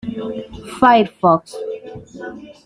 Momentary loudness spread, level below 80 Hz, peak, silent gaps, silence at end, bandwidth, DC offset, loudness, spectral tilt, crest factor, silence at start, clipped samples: 20 LU; -50 dBFS; -2 dBFS; none; 0.15 s; 12 kHz; under 0.1%; -16 LUFS; -6 dB/octave; 18 dB; 0.05 s; under 0.1%